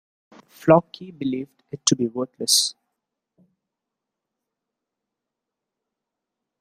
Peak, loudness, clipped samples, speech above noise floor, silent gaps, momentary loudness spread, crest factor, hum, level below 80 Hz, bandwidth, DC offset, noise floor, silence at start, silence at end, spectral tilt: -2 dBFS; -21 LUFS; under 0.1%; 63 dB; none; 13 LU; 24 dB; none; -68 dBFS; 15.5 kHz; under 0.1%; -85 dBFS; 0.65 s; 3.9 s; -3.5 dB/octave